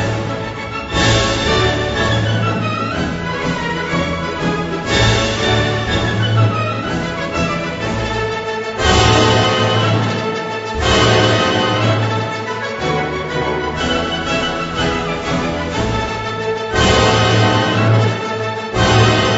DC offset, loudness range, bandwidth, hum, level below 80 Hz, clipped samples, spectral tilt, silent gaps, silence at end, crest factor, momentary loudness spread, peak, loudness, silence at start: under 0.1%; 4 LU; 8 kHz; none; -32 dBFS; under 0.1%; -5 dB/octave; none; 0 s; 16 dB; 9 LU; 0 dBFS; -16 LUFS; 0 s